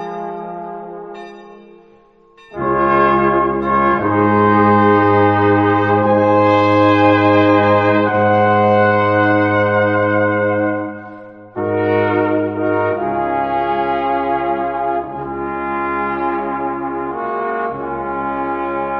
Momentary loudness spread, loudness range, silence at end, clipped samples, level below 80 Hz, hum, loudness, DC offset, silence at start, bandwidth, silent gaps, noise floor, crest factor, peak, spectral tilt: 14 LU; 8 LU; 0 s; under 0.1%; -46 dBFS; none; -15 LUFS; under 0.1%; 0 s; 6.2 kHz; none; -48 dBFS; 14 dB; 0 dBFS; -8.5 dB/octave